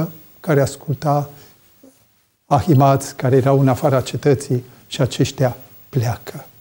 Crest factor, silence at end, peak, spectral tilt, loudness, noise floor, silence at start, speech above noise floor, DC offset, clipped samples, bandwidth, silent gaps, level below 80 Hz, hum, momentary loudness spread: 16 dB; 0.15 s; -2 dBFS; -7 dB/octave; -18 LUFS; -59 dBFS; 0 s; 42 dB; under 0.1%; under 0.1%; 17.5 kHz; none; -50 dBFS; none; 15 LU